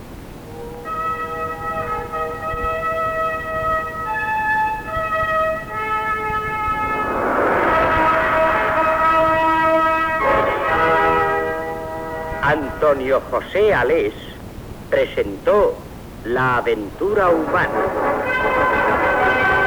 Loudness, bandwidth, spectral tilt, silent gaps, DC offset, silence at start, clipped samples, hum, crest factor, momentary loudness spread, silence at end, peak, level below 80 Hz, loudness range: -18 LUFS; over 20 kHz; -6 dB/octave; none; under 0.1%; 0 s; under 0.1%; none; 14 dB; 11 LU; 0 s; -6 dBFS; -38 dBFS; 5 LU